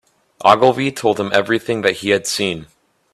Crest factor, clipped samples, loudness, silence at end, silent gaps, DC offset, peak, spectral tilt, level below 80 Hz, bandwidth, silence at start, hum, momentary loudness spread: 18 dB; under 0.1%; -16 LUFS; 0.5 s; none; under 0.1%; 0 dBFS; -4 dB/octave; -56 dBFS; 14.5 kHz; 0.4 s; none; 8 LU